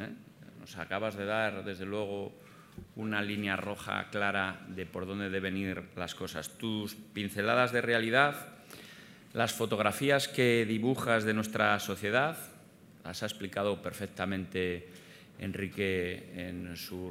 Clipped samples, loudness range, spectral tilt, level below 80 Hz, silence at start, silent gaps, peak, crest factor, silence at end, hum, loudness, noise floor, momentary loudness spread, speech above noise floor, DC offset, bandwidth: under 0.1%; 7 LU; -4.5 dB/octave; -70 dBFS; 0 s; none; -8 dBFS; 24 dB; 0 s; none; -32 LUFS; -56 dBFS; 19 LU; 23 dB; under 0.1%; 16 kHz